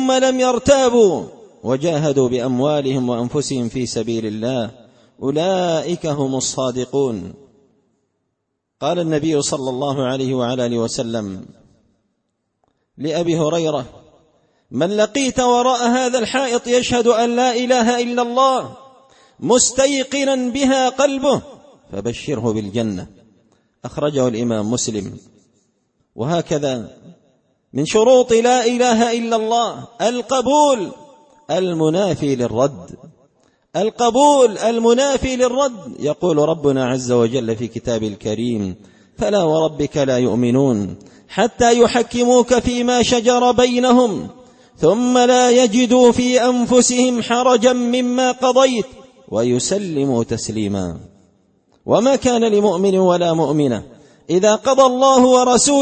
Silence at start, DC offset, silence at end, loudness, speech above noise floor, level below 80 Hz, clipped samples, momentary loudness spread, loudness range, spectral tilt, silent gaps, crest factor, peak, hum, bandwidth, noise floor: 0 s; under 0.1%; 0 s; -16 LUFS; 58 dB; -48 dBFS; under 0.1%; 12 LU; 9 LU; -4.5 dB/octave; none; 16 dB; 0 dBFS; none; 8.8 kHz; -74 dBFS